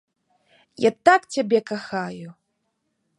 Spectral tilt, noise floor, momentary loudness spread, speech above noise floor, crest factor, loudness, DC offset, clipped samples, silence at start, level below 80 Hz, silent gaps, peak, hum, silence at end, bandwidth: -4.5 dB/octave; -74 dBFS; 14 LU; 53 dB; 22 dB; -21 LUFS; under 0.1%; under 0.1%; 0.8 s; -72 dBFS; none; -2 dBFS; none; 0.9 s; 11.5 kHz